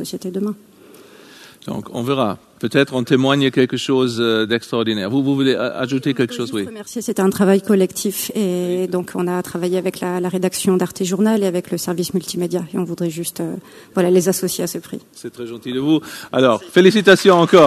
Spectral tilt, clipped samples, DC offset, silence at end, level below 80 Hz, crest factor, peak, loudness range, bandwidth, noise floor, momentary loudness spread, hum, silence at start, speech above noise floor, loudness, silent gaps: -5 dB/octave; under 0.1%; under 0.1%; 0 s; -60 dBFS; 18 dB; 0 dBFS; 4 LU; 14 kHz; -43 dBFS; 12 LU; none; 0 s; 26 dB; -18 LUFS; none